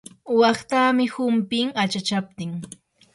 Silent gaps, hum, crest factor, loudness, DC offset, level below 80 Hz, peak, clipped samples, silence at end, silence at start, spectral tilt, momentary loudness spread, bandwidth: none; none; 16 dB; -22 LUFS; under 0.1%; -66 dBFS; -6 dBFS; under 0.1%; 0.5 s; 0.25 s; -5 dB/octave; 13 LU; 11.5 kHz